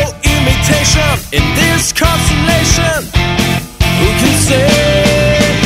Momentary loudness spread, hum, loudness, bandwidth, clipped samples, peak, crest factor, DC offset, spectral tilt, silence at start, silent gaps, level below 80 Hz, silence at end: 4 LU; none; -10 LUFS; 16.5 kHz; under 0.1%; 0 dBFS; 10 dB; under 0.1%; -4 dB/octave; 0 s; none; -20 dBFS; 0 s